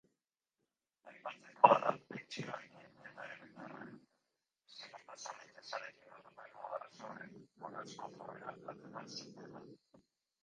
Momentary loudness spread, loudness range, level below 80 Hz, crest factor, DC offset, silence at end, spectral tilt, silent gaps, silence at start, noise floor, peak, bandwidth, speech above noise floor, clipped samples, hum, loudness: 23 LU; 15 LU; -90 dBFS; 34 dB; under 0.1%; 0.7 s; -4.5 dB/octave; none; 1.05 s; under -90 dBFS; -8 dBFS; 9.6 kHz; over 53 dB; under 0.1%; none; -39 LUFS